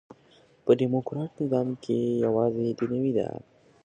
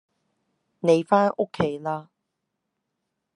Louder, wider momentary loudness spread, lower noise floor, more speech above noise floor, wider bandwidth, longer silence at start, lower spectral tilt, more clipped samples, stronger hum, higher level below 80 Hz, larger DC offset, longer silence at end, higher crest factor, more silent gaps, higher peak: second, -27 LUFS vs -23 LUFS; about the same, 10 LU vs 12 LU; second, -59 dBFS vs -80 dBFS; second, 33 dB vs 58 dB; second, 9.2 kHz vs 11 kHz; second, 0.65 s vs 0.85 s; first, -9 dB/octave vs -7 dB/octave; neither; neither; about the same, -66 dBFS vs -66 dBFS; neither; second, 0.45 s vs 1.35 s; about the same, 20 dB vs 22 dB; neither; second, -8 dBFS vs -4 dBFS